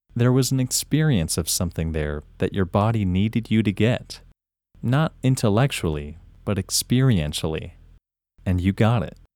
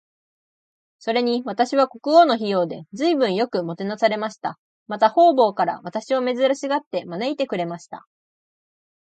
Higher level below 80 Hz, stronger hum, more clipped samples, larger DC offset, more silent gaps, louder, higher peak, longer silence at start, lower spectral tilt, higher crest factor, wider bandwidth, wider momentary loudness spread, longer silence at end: first, -40 dBFS vs -76 dBFS; neither; neither; neither; second, none vs 4.58-4.86 s, 6.87-6.91 s; about the same, -22 LUFS vs -21 LUFS; about the same, -4 dBFS vs -2 dBFS; second, 0.15 s vs 1.05 s; about the same, -5.5 dB/octave vs -5.5 dB/octave; about the same, 18 dB vs 18 dB; first, 18.5 kHz vs 9 kHz; second, 11 LU vs 14 LU; second, 0.25 s vs 1.2 s